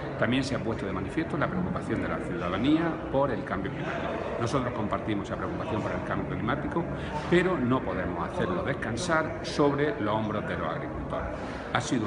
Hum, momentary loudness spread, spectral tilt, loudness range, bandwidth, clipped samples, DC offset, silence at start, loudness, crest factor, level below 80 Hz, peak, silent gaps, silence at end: none; 7 LU; -6 dB/octave; 3 LU; 11 kHz; under 0.1%; under 0.1%; 0 s; -29 LUFS; 22 dB; -46 dBFS; -8 dBFS; none; 0 s